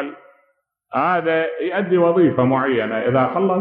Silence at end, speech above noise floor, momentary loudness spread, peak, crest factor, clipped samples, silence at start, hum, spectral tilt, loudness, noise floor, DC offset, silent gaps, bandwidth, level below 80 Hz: 0 s; 48 dB; 6 LU; -4 dBFS; 14 dB; under 0.1%; 0 s; none; -11 dB/octave; -18 LUFS; -66 dBFS; under 0.1%; none; 4.7 kHz; -62 dBFS